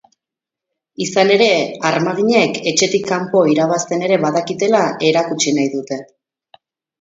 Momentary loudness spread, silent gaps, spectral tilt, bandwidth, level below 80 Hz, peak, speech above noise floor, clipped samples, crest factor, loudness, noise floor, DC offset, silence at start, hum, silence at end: 6 LU; none; -4 dB/octave; 8 kHz; -64 dBFS; 0 dBFS; 70 dB; under 0.1%; 16 dB; -15 LUFS; -85 dBFS; under 0.1%; 1 s; none; 0.95 s